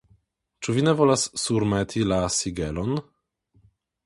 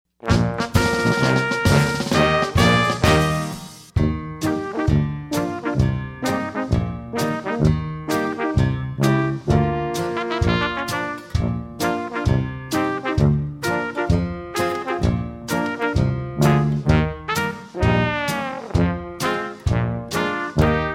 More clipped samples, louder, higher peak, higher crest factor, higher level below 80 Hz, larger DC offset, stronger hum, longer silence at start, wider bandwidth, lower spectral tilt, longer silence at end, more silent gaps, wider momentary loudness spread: neither; second, -24 LUFS vs -21 LUFS; about the same, -4 dBFS vs -2 dBFS; about the same, 20 dB vs 18 dB; second, -46 dBFS vs -32 dBFS; neither; neither; first, 0.6 s vs 0.25 s; second, 11.5 kHz vs 16.5 kHz; about the same, -5 dB/octave vs -6 dB/octave; first, 1.05 s vs 0 s; neither; about the same, 9 LU vs 7 LU